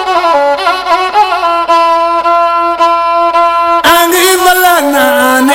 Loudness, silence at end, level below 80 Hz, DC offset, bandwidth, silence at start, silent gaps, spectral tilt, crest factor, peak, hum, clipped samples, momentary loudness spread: -8 LUFS; 0 s; -42 dBFS; under 0.1%; 17.5 kHz; 0 s; none; -1 dB/octave; 8 dB; 0 dBFS; none; 0.3%; 4 LU